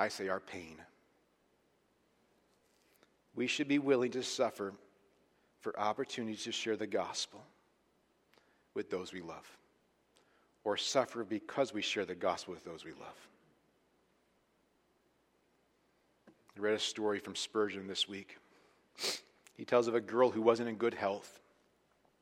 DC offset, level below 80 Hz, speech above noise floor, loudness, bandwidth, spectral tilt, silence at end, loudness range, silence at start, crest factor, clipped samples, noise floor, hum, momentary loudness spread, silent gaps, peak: under 0.1%; -82 dBFS; 39 dB; -36 LUFS; 15.5 kHz; -3.5 dB/octave; 0.85 s; 11 LU; 0 s; 24 dB; under 0.1%; -75 dBFS; none; 17 LU; none; -14 dBFS